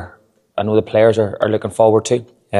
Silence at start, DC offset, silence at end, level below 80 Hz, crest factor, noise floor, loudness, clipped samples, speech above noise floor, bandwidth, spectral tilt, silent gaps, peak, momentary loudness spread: 0 s; under 0.1%; 0 s; -58 dBFS; 16 dB; -48 dBFS; -16 LUFS; under 0.1%; 34 dB; 12 kHz; -6 dB/octave; none; 0 dBFS; 8 LU